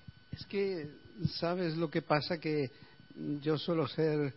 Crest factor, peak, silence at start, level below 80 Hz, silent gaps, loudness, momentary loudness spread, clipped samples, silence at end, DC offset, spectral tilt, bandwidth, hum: 22 dB; -14 dBFS; 0.3 s; -66 dBFS; none; -35 LUFS; 13 LU; under 0.1%; 0 s; under 0.1%; -5 dB/octave; 5.8 kHz; none